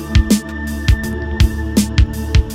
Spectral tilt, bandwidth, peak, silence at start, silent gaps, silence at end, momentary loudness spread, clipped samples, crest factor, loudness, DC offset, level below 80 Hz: -5.5 dB/octave; 16.5 kHz; 0 dBFS; 0 s; none; 0 s; 5 LU; under 0.1%; 14 dB; -17 LUFS; under 0.1%; -18 dBFS